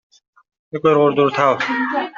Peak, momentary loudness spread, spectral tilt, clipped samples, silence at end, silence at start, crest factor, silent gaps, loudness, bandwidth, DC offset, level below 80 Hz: -2 dBFS; 6 LU; -6.5 dB/octave; under 0.1%; 0.05 s; 0.75 s; 16 dB; none; -16 LUFS; 7.4 kHz; under 0.1%; -62 dBFS